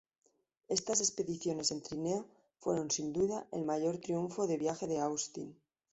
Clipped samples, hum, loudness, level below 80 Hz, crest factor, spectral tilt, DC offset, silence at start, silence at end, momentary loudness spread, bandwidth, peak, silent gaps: under 0.1%; none; -35 LUFS; -70 dBFS; 20 dB; -4 dB/octave; under 0.1%; 0.7 s; 0.4 s; 8 LU; 8.2 kHz; -16 dBFS; none